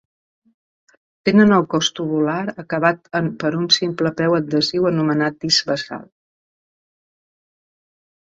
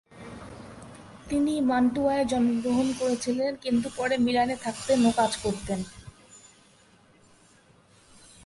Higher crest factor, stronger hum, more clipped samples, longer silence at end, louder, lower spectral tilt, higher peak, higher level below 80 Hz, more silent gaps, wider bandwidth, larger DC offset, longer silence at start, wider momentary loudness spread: about the same, 18 dB vs 18 dB; neither; neither; first, 2.35 s vs 2.1 s; first, -18 LUFS vs -26 LUFS; about the same, -4.5 dB/octave vs -4.5 dB/octave; first, -2 dBFS vs -10 dBFS; second, -60 dBFS vs -54 dBFS; neither; second, 8 kHz vs 11.5 kHz; neither; first, 1.25 s vs 0.15 s; second, 10 LU vs 21 LU